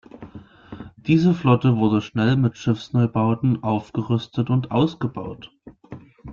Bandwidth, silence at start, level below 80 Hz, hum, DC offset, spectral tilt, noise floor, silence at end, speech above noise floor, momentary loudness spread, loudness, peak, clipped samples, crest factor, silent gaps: 7 kHz; 0.15 s; -54 dBFS; none; under 0.1%; -8.5 dB/octave; -42 dBFS; 0 s; 22 dB; 22 LU; -21 LUFS; -4 dBFS; under 0.1%; 18 dB; none